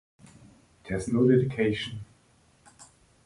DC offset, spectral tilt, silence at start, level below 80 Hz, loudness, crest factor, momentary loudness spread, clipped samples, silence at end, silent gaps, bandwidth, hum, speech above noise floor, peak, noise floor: under 0.1%; -7 dB/octave; 0.85 s; -56 dBFS; -26 LUFS; 18 dB; 14 LU; under 0.1%; 0.4 s; none; 11.5 kHz; none; 37 dB; -10 dBFS; -62 dBFS